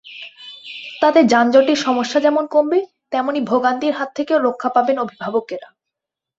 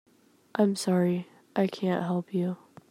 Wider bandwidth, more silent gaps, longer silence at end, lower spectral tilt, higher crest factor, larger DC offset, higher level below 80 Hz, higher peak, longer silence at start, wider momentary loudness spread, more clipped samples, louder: second, 8 kHz vs 15.5 kHz; neither; first, 0.75 s vs 0.35 s; second, -4.5 dB/octave vs -6.5 dB/octave; about the same, 16 dB vs 18 dB; neither; first, -64 dBFS vs -78 dBFS; first, -2 dBFS vs -10 dBFS; second, 0.05 s vs 0.55 s; first, 19 LU vs 9 LU; neither; first, -17 LUFS vs -29 LUFS